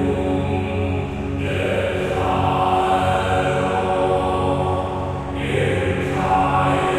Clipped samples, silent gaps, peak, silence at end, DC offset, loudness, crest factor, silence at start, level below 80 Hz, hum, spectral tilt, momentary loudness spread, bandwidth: under 0.1%; none; -6 dBFS; 0 s; under 0.1%; -20 LUFS; 14 dB; 0 s; -36 dBFS; none; -6.5 dB/octave; 6 LU; 13.5 kHz